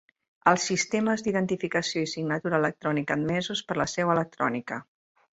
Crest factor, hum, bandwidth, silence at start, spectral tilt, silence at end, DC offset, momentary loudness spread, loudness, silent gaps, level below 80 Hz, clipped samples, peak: 22 dB; none; 8.2 kHz; 0.45 s; -4.5 dB/octave; 0.6 s; under 0.1%; 5 LU; -27 LUFS; none; -62 dBFS; under 0.1%; -6 dBFS